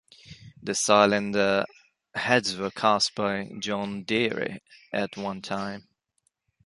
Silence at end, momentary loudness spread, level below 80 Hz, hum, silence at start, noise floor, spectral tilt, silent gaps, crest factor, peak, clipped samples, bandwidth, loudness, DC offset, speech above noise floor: 0.85 s; 15 LU; -64 dBFS; none; 0.25 s; -74 dBFS; -3.5 dB/octave; none; 24 dB; -4 dBFS; under 0.1%; 11.5 kHz; -26 LUFS; under 0.1%; 48 dB